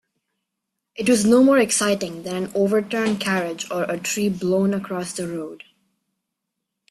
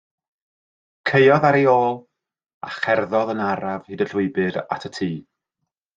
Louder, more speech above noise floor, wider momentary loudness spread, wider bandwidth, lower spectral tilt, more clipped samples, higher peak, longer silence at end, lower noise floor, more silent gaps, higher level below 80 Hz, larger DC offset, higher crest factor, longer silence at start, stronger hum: about the same, -21 LUFS vs -20 LUFS; about the same, 60 dB vs 61 dB; about the same, 13 LU vs 14 LU; first, 14 kHz vs 7.6 kHz; second, -4.5 dB/octave vs -7 dB/octave; neither; about the same, -6 dBFS vs -4 dBFS; first, 1.35 s vs 0.75 s; about the same, -81 dBFS vs -80 dBFS; second, none vs 2.54-2.61 s; first, -60 dBFS vs -66 dBFS; neither; about the same, 16 dB vs 18 dB; about the same, 0.95 s vs 1.05 s; neither